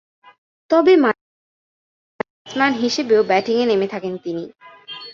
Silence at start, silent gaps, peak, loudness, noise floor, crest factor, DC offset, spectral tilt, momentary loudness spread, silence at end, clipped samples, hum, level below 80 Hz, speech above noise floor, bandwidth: 0.7 s; 1.21-2.19 s, 2.30-2.45 s; -2 dBFS; -18 LUFS; under -90 dBFS; 18 dB; under 0.1%; -4.5 dB/octave; 17 LU; 0 s; under 0.1%; none; -66 dBFS; over 73 dB; 7.6 kHz